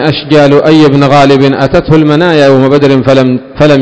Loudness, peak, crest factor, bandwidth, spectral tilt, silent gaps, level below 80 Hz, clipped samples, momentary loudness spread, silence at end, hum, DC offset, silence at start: -5 LUFS; 0 dBFS; 4 dB; 8 kHz; -7 dB/octave; none; -32 dBFS; 20%; 3 LU; 0 s; none; under 0.1%; 0 s